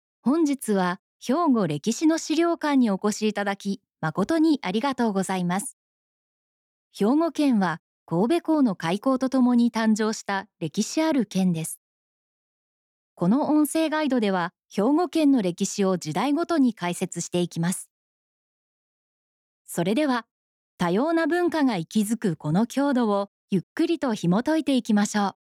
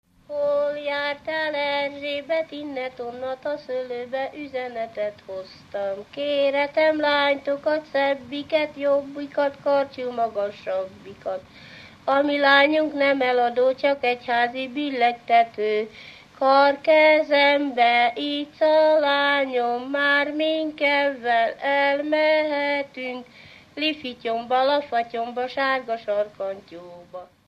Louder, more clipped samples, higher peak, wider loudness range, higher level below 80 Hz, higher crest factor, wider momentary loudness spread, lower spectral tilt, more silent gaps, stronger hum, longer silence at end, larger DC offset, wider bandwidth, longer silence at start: about the same, -24 LUFS vs -22 LUFS; neither; second, -14 dBFS vs -6 dBFS; second, 5 LU vs 8 LU; about the same, -72 dBFS vs -68 dBFS; second, 12 dB vs 18 dB; second, 7 LU vs 14 LU; about the same, -5.5 dB/octave vs -4.5 dB/octave; first, 0.99-1.20 s, 5.73-6.91 s, 7.79-8.06 s, 11.77-13.16 s, 17.90-19.65 s, 20.31-20.78 s, 23.28-23.48 s, 23.63-23.76 s vs none; neither; about the same, 0.25 s vs 0.25 s; neither; first, 15.5 kHz vs 7.8 kHz; about the same, 0.25 s vs 0.3 s